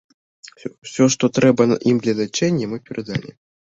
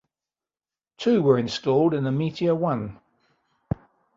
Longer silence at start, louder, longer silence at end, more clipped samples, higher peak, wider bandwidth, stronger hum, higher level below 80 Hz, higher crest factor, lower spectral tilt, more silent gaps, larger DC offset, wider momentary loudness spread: second, 0.65 s vs 1 s; first, -19 LUFS vs -24 LUFS; about the same, 0.45 s vs 0.45 s; neither; first, -2 dBFS vs -6 dBFS; about the same, 8 kHz vs 7.8 kHz; neither; about the same, -58 dBFS vs -54 dBFS; about the same, 18 dB vs 20 dB; second, -5.5 dB/octave vs -7.5 dB/octave; first, 0.78-0.82 s vs none; neither; about the same, 15 LU vs 13 LU